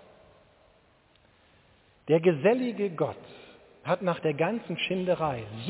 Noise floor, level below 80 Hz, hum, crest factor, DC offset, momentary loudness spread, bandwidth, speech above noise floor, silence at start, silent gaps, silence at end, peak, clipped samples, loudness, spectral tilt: -63 dBFS; -64 dBFS; none; 20 dB; under 0.1%; 14 LU; 4 kHz; 35 dB; 2.05 s; none; 0 s; -10 dBFS; under 0.1%; -28 LUFS; -10.5 dB/octave